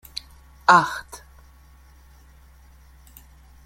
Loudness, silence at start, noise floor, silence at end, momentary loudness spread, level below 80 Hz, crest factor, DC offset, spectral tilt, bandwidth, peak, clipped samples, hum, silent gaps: -19 LUFS; 0.7 s; -50 dBFS; 2.5 s; 27 LU; -50 dBFS; 24 dB; under 0.1%; -3.5 dB/octave; 16.5 kHz; -2 dBFS; under 0.1%; none; none